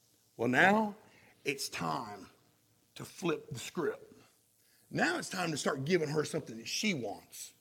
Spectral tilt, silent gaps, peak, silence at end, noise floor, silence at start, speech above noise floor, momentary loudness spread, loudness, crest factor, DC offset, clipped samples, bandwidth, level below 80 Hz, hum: -4 dB/octave; none; -12 dBFS; 0.1 s; -70 dBFS; 0.4 s; 36 dB; 20 LU; -34 LUFS; 24 dB; under 0.1%; under 0.1%; 17.5 kHz; -74 dBFS; none